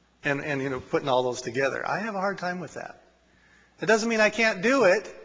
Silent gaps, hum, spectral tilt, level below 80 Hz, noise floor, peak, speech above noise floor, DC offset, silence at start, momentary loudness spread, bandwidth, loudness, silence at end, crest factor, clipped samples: none; none; -4.5 dB/octave; -64 dBFS; -60 dBFS; -8 dBFS; 35 dB; under 0.1%; 0.25 s; 11 LU; 8 kHz; -25 LUFS; 0 s; 20 dB; under 0.1%